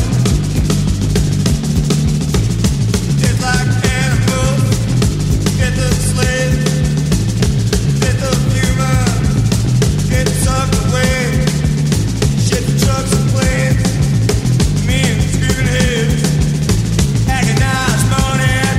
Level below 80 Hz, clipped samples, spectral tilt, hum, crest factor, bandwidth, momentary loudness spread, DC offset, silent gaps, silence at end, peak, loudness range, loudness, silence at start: -22 dBFS; under 0.1%; -5 dB/octave; none; 12 dB; 16 kHz; 2 LU; under 0.1%; none; 0 s; -2 dBFS; 1 LU; -14 LUFS; 0 s